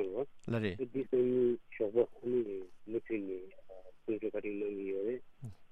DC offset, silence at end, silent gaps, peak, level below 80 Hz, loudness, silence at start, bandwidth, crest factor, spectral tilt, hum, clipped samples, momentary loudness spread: under 0.1%; 0.05 s; none; -18 dBFS; -66 dBFS; -36 LUFS; 0 s; 4.4 kHz; 18 dB; -9 dB/octave; none; under 0.1%; 15 LU